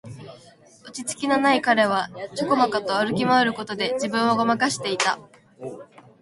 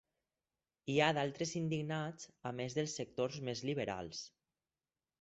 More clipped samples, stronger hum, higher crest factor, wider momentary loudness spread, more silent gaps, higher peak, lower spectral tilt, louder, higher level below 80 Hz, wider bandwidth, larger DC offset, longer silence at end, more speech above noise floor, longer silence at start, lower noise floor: neither; neither; second, 18 dB vs 24 dB; first, 19 LU vs 14 LU; neither; first, -4 dBFS vs -16 dBFS; about the same, -3.5 dB/octave vs -4.5 dB/octave; first, -22 LUFS vs -39 LUFS; first, -64 dBFS vs -72 dBFS; first, 11.5 kHz vs 8 kHz; neither; second, 0.35 s vs 0.95 s; second, 28 dB vs over 52 dB; second, 0.05 s vs 0.85 s; second, -51 dBFS vs under -90 dBFS